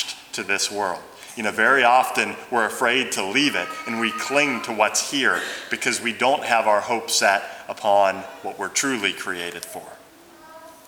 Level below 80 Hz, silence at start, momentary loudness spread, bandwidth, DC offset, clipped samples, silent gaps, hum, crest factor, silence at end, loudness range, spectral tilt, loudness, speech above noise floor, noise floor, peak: -70 dBFS; 0 s; 12 LU; over 20 kHz; under 0.1%; under 0.1%; none; none; 20 dB; 0.15 s; 3 LU; -1.5 dB/octave; -21 LUFS; 26 dB; -47 dBFS; -2 dBFS